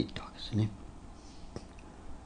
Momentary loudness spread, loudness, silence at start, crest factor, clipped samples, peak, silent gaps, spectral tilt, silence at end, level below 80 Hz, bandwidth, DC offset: 18 LU; -38 LUFS; 0 s; 22 dB; under 0.1%; -16 dBFS; none; -6.5 dB/octave; 0 s; -50 dBFS; 10 kHz; under 0.1%